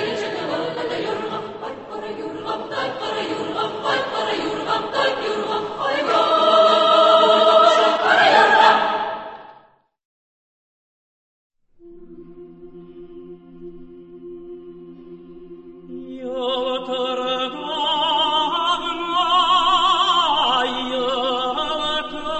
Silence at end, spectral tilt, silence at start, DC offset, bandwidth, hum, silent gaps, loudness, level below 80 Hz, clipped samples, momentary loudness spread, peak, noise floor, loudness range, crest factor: 0 s; -3 dB/octave; 0 s; under 0.1%; 8.4 kHz; none; 10.05-11.50 s; -18 LUFS; -58 dBFS; under 0.1%; 18 LU; 0 dBFS; -53 dBFS; 18 LU; 20 dB